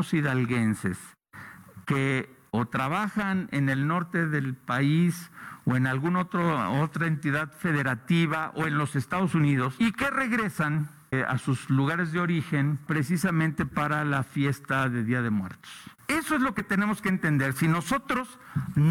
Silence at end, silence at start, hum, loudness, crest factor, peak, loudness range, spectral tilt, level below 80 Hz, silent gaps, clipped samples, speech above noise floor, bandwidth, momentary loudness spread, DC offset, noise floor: 0 s; 0 s; none; -27 LUFS; 12 dB; -14 dBFS; 2 LU; -6.5 dB/octave; -58 dBFS; none; under 0.1%; 20 dB; 16.5 kHz; 7 LU; under 0.1%; -47 dBFS